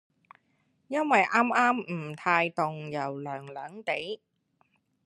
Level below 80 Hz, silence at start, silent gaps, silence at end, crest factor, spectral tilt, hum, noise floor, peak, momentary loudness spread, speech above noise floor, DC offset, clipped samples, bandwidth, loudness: -80 dBFS; 0.9 s; none; 0.9 s; 22 dB; -5.5 dB/octave; none; -72 dBFS; -8 dBFS; 15 LU; 43 dB; under 0.1%; under 0.1%; 12 kHz; -28 LUFS